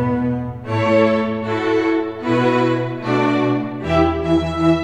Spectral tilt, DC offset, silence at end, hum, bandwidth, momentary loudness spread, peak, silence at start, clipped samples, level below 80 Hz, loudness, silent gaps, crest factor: -7.5 dB/octave; 0.3%; 0 s; none; 9 kHz; 6 LU; -2 dBFS; 0 s; under 0.1%; -40 dBFS; -18 LUFS; none; 14 dB